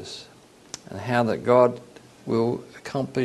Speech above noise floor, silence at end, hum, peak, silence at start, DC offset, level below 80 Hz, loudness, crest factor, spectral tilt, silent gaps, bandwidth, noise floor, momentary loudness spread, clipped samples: 21 dB; 0 s; none; -4 dBFS; 0 s; under 0.1%; -64 dBFS; -24 LUFS; 20 dB; -6 dB/octave; none; 12.5 kHz; -44 dBFS; 21 LU; under 0.1%